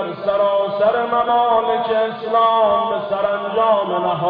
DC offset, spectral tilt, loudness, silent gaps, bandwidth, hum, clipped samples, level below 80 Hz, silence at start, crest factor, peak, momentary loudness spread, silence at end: under 0.1%; -8.5 dB/octave; -17 LUFS; none; 5 kHz; none; under 0.1%; -56 dBFS; 0 s; 14 dB; -4 dBFS; 5 LU; 0 s